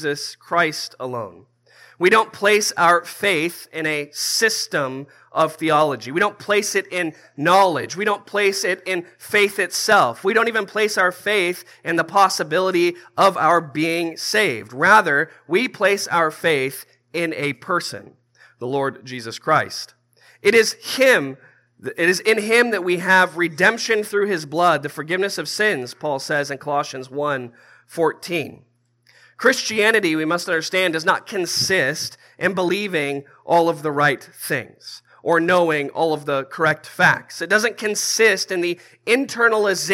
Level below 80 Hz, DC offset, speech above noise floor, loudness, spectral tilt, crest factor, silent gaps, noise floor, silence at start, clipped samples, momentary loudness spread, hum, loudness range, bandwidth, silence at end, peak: -74 dBFS; under 0.1%; 38 dB; -19 LUFS; -3 dB/octave; 20 dB; none; -58 dBFS; 0 s; under 0.1%; 12 LU; none; 5 LU; 16.5 kHz; 0 s; 0 dBFS